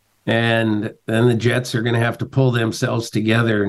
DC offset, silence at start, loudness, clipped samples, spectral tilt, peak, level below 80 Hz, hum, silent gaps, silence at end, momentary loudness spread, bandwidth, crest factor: under 0.1%; 0.25 s; -19 LUFS; under 0.1%; -6 dB/octave; -4 dBFS; -56 dBFS; none; none; 0 s; 5 LU; 12.5 kHz; 14 dB